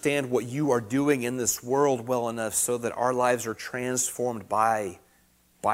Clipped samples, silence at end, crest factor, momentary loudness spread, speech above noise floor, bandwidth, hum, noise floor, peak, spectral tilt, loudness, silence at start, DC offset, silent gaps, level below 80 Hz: under 0.1%; 0 s; 18 dB; 6 LU; 37 dB; 16 kHz; none; -63 dBFS; -8 dBFS; -4 dB/octave; -26 LUFS; 0.05 s; under 0.1%; none; -64 dBFS